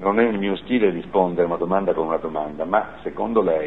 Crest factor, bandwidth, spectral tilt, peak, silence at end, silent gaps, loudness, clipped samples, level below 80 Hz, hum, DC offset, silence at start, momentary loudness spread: 18 dB; 4.1 kHz; -9 dB/octave; -2 dBFS; 0 s; none; -22 LUFS; under 0.1%; -50 dBFS; none; 0.5%; 0 s; 7 LU